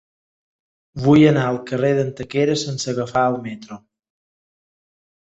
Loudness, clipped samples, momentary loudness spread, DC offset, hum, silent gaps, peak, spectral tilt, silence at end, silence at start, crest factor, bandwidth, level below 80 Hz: -18 LUFS; under 0.1%; 19 LU; under 0.1%; none; none; -2 dBFS; -6 dB/octave; 1.5 s; 0.95 s; 18 dB; 8.2 kHz; -54 dBFS